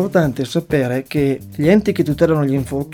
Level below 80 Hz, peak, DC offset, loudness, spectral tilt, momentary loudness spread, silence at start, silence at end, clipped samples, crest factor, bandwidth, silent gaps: -42 dBFS; -2 dBFS; under 0.1%; -17 LUFS; -7.5 dB/octave; 5 LU; 0 s; 0 s; under 0.1%; 14 dB; 17.5 kHz; none